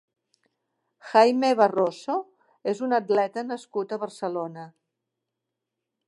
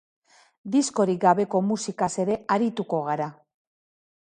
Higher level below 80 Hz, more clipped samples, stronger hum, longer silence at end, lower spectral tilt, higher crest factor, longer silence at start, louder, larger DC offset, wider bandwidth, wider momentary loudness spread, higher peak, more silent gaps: second, -84 dBFS vs -68 dBFS; neither; neither; first, 1.4 s vs 1 s; about the same, -5 dB/octave vs -5.5 dB/octave; about the same, 22 dB vs 20 dB; first, 1.05 s vs 0.65 s; about the same, -25 LUFS vs -24 LUFS; neither; about the same, 11.5 kHz vs 11 kHz; first, 13 LU vs 8 LU; about the same, -4 dBFS vs -6 dBFS; neither